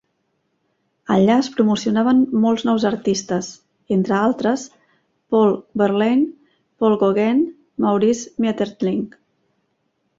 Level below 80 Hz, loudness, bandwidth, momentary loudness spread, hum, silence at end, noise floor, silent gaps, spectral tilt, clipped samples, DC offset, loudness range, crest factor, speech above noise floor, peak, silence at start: -60 dBFS; -19 LUFS; 7.8 kHz; 9 LU; none; 1.1 s; -70 dBFS; none; -6 dB/octave; under 0.1%; under 0.1%; 2 LU; 16 dB; 52 dB; -4 dBFS; 1.1 s